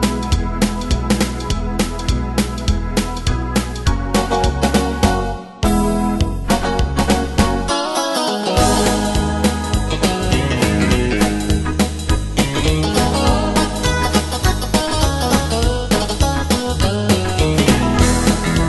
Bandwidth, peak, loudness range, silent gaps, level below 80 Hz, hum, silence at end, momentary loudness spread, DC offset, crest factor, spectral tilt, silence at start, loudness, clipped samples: 12.5 kHz; 0 dBFS; 3 LU; none; -22 dBFS; none; 0 s; 5 LU; under 0.1%; 16 dB; -5 dB/octave; 0 s; -17 LUFS; under 0.1%